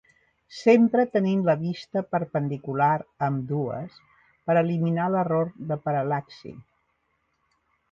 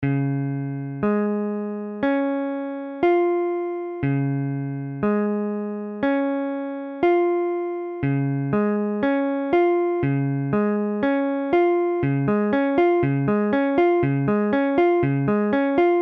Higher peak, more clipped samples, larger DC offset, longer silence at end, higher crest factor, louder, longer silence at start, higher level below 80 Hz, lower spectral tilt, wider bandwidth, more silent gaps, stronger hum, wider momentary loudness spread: about the same, -6 dBFS vs -8 dBFS; neither; neither; first, 1.3 s vs 0 s; about the same, 18 dB vs 14 dB; second, -25 LUFS vs -22 LUFS; first, 0.5 s vs 0 s; second, -66 dBFS vs -54 dBFS; second, -8.5 dB/octave vs -10.5 dB/octave; first, 7.4 kHz vs 4.8 kHz; neither; neither; first, 16 LU vs 8 LU